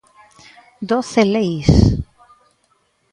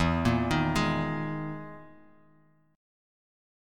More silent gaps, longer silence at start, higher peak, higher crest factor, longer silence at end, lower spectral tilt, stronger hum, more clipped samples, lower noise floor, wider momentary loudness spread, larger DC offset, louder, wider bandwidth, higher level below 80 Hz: neither; first, 0.8 s vs 0 s; first, 0 dBFS vs -12 dBFS; about the same, 18 dB vs 18 dB; first, 1.1 s vs 0.95 s; about the same, -7 dB/octave vs -6 dB/octave; neither; neither; about the same, -62 dBFS vs -63 dBFS; about the same, 16 LU vs 17 LU; neither; first, -16 LUFS vs -29 LUFS; second, 11 kHz vs 15 kHz; first, -28 dBFS vs -46 dBFS